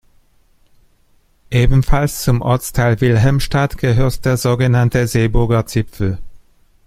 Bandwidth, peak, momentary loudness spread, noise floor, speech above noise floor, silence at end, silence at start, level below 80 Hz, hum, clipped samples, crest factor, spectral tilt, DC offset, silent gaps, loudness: 15.5 kHz; 0 dBFS; 6 LU; -54 dBFS; 41 dB; 0.5 s; 1.5 s; -26 dBFS; none; under 0.1%; 14 dB; -6.5 dB/octave; under 0.1%; none; -16 LUFS